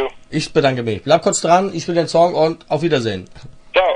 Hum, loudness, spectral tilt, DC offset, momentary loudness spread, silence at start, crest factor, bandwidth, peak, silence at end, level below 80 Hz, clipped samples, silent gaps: none; -17 LUFS; -4.5 dB/octave; under 0.1%; 8 LU; 0 s; 16 dB; 10.5 kHz; 0 dBFS; 0 s; -48 dBFS; under 0.1%; none